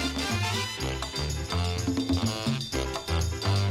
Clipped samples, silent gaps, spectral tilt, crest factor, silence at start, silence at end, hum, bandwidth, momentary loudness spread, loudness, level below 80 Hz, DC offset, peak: under 0.1%; none; -4.5 dB/octave; 14 dB; 0 s; 0 s; none; 16 kHz; 4 LU; -29 LUFS; -40 dBFS; under 0.1%; -14 dBFS